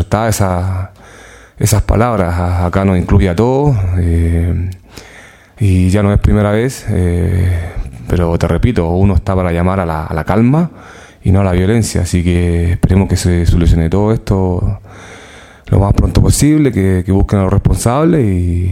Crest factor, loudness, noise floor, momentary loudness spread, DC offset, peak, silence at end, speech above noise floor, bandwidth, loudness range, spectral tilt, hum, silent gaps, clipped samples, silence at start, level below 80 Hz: 12 dB; -13 LUFS; -38 dBFS; 7 LU; under 0.1%; 0 dBFS; 0 s; 27 dB; 16 kHz; 2 LU; -7 dB/octave; none; none; under 0.1%; 0 s; -22 dBFS